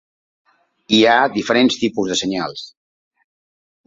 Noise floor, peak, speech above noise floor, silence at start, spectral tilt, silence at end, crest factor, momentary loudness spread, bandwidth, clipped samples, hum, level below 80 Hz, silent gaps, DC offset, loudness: under -90 dBFS; -2 dBFS; over 74 dB; 0.9 s; -3.5 dB/octave; 1.2 s; 18 dB; 15 LU; 7.8 kHz; under 0.1%; none; -60 dBFS; none; under 0.1%; -16 LUFS